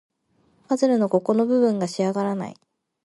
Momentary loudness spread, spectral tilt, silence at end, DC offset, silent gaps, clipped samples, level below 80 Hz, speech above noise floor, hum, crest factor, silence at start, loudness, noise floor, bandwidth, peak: 8 LU; -6.5 dB/octave; 0.5 s; under 0.1%; none; under 0.1%; -72 dBFS; 43 dB; none; 16 dB; 0.7 s; -22 LUFS; -64 dBFS; 11.5 kHz; -6 dBFS